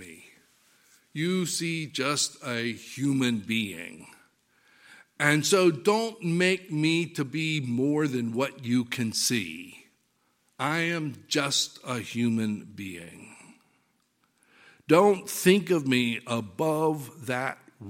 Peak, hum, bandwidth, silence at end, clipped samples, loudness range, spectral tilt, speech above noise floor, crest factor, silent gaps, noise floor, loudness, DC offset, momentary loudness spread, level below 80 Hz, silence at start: -4 dBFS; none; 16.5 kHz; 0 s; under 0.1%; 5 LU; -4 dB/octave; 44 dB; 24 dB; none; -71 dBFS; -27 LUFS; under 0.1%; 14 LU; -72 dBFS; 0 s